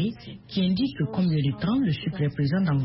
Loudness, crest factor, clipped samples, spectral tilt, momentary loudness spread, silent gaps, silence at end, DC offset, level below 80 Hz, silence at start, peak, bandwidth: -26 LUFS; 10 dB; under 0.1%; -11.5 dB/octave; 5 LU; none; 0 s; under 0.1%; -52 dBFS; 0 s; -14 dBFS; 5.8 kHz